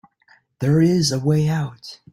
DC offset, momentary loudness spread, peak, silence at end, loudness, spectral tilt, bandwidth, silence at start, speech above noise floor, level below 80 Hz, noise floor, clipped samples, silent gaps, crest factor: under 0.1%; 12 LU; -6 dBFS; 0.15 s; -19 LUFS; -6 dB/octave; 15 kHz; 0.6 s; 39 dB; -54 dBFS; -57 dBFS; under 0.1%; none; 14 dB